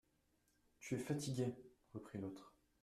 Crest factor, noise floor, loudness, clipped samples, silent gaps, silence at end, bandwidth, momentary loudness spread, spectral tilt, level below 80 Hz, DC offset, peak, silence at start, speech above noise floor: 18 dB; -80 dBFS; -46 LUFS; under 0.1%; none; 0.35 s; 14 kHz; 15 LU; -6 dB/octave; -76 dBFS; under 0.1%; -30 dBFS; 0.8 s; 36 dB